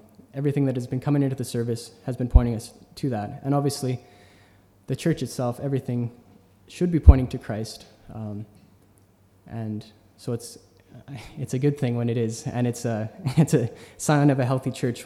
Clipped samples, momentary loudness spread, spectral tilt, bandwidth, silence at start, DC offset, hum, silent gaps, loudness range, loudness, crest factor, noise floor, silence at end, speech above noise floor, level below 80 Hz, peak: under 0.1%; 17 LU; -7 dB/octave; 14.5 kHz; 0.35 s; under 0.1%; none; none; 12 LU; -25 LUFS; 24 dB; -58 dBFS; 0 s; 34 dB; -30 dBFS; 0 dBFS